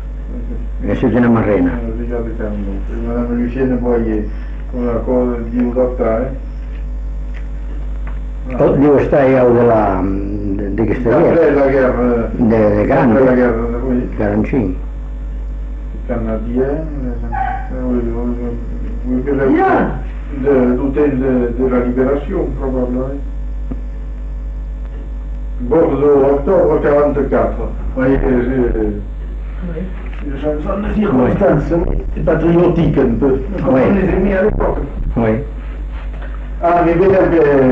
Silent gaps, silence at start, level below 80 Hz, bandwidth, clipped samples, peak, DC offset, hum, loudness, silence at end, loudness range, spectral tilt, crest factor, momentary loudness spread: none; 0 s; -22 dBFS; 5.2 kHz; under 0.1%; -2 dBFS; under 0.1%; none; -15 LUFS; 0 s; 7 LU; -10 dB/octave; 12 dB; 15 LU